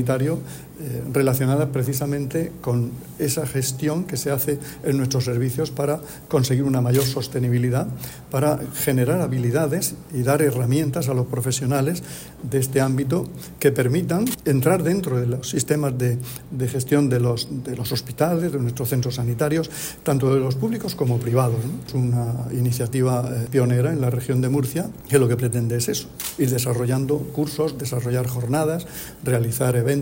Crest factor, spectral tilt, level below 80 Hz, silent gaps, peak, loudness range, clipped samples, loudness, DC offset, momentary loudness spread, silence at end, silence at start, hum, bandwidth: 18 dB; -6 dB/octave; -50 dBFS; none; -4 dBFS; 2 LU; under 0.1%; -22 LUFS; under 0.1%; 7 LU; 0 s; 0 s; none; 16.5 kHz